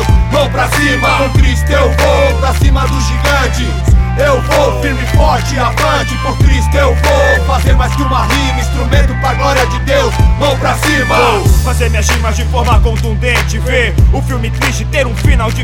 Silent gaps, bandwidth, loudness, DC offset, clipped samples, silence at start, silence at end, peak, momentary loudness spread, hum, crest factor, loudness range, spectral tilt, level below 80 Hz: none; 16.5 kHz; -11 LUFS; under 0.1%; under 0.1%; 0 s; 0 s; 0 dBFS; 4 LU; none; 10 dB; 1 LU; -5 dB/octave; -14 dBFS